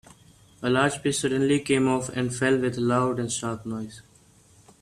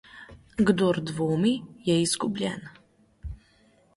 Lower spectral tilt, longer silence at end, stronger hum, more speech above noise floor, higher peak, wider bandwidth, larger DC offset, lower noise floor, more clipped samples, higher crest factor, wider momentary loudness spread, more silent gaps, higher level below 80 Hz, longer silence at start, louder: about the same, -5 dB/octave vs -5 dB/octave; first, 0.8 s vs 0.6 s; neither; second, 32 dB vs 36 dB; about the same, -8 dBFS vs -8 dBFS; first, 13.5 kHz vs 11.5 kHz; neither; second, -56 dBFS vs -61 dBFS; neither; about the same, 18 dB vs 20 dB; second, 10 LU vs 21 LU; neither; second, -58 dBFS vs -50 dBFS; first, 0.6 s vs 0.15 s; about the same, -25 LUFS vs -26 LUFS